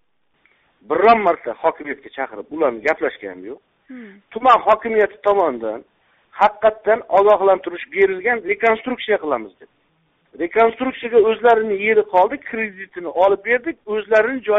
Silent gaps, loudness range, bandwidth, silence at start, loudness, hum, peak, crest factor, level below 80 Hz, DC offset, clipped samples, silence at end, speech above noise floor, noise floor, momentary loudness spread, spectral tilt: none; 3 LU; 7.4 kHz; 0.9 s; -18 LUFS; none; -2 dBFS; 16 dB; -58 dBFS; under 0.1%; under 0.1%; 0 s; 45 dB; -63 dBFS; 14 LU; -2 dB/octave